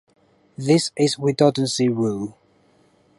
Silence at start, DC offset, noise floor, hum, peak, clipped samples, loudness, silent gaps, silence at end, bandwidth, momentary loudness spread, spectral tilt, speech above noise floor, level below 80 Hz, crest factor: 0.6 s; under 0.1%; -58 dBFS; none; -4 dBFS; under 0.1%; -20 LUFS; none; 0.9 s; 11.5 kHz; 12 LU; -5.5 dB/octave; 39 dB; -64 dBFS; 18 dB